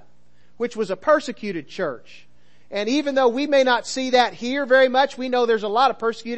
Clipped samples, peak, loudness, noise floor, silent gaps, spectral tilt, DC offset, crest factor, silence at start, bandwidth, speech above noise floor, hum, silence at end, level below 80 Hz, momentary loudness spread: under 0.1%; -4 dBFS; -21 LUFS; -61 dBFS; none; -3.5 dB/octave; 0.8%; 18 dB; 0.6 s; 8.6 kHz; 40 dB; 60 Hz at -55 dBFS; 0 s; -66 dBFS; 12 LU